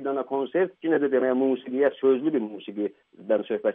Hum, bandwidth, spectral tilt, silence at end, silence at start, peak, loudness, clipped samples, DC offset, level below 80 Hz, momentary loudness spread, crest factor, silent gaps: none; 3.8 kHz; -5 dB/octave; 0 s; 0 s; -8 dBFS; -25 LUFS; under 0.1%; under 0.1%; -80 dBFS; 9 LU; 16 dB; none